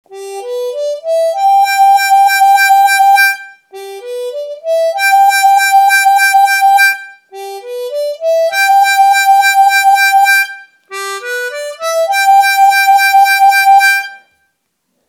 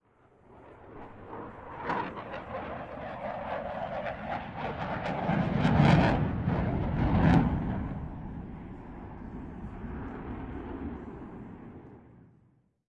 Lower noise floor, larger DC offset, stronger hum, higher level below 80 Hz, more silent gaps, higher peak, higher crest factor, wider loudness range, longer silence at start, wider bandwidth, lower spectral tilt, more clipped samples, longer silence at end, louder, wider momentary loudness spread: about the same, -66 dBFS vs -66 dBFS; neither; neither; second, -80 dBFS vs -44 dBFS; neither; first, 0 dBFS vs -10 dBFS; second, 10 dB vs 22 dB; second, 2 LU vs 15 LU; second, 0.1 s vs 0.5 s; first, 19 kHz vs 8.2 kHz; second, 3.5 dB/octave vs -8.5 dB/octave; neither; first, 0.9 s vs 0.7 s; first, -8 LUFS vs -31 LUFS; second, 15 LU vs 21 LU